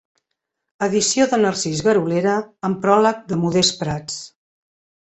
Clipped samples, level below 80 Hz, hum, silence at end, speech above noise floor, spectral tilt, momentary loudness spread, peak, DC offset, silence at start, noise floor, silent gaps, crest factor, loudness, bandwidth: under 0.1%; -54 dBFS; none; 0.8 s; 60 dB; -4 dB/octave; 9 LU; -2 dBFS; under 0.1%; 0.8 s; -78 dBFS; none; 18 dB; -19 LUFS; 8.2 kHz